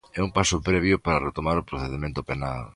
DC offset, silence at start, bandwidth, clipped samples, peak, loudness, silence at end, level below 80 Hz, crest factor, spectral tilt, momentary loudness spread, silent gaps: under 0.1%; 0.15 s; 11.5 kHz; under 0.1%; -6 dBFS; -25 LUFS; 0.05 s; -38 dBFS; 20 dB; -5 dB/octave; 8 LU; none